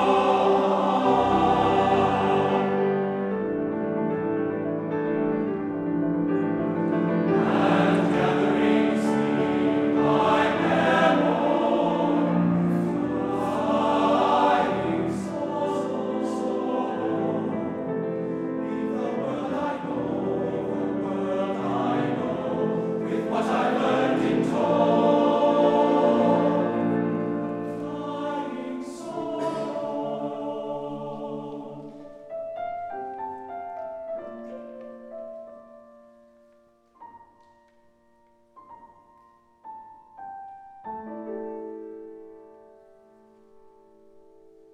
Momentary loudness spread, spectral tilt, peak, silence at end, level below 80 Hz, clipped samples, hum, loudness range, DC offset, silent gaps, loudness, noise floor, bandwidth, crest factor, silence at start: 17 LU; -7 dB/octave; -8 dBFS; 2.25 s; -58 dBFS; under 0.1%; none; 18 LU; under 0.1%; none; -24 LUFS; -61 dBFS; 10.5 kHz; 18 dB; 0 s